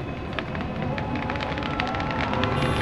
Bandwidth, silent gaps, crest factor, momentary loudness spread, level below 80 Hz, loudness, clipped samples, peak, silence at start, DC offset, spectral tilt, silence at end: 12.5 kHz; none; 22 dB; 6 LU; -40 dBFS; -27 LUFS; under 0.1%; -4 dBFS; 0 s; under 0.1%; -6.5 dB/octave; 0 s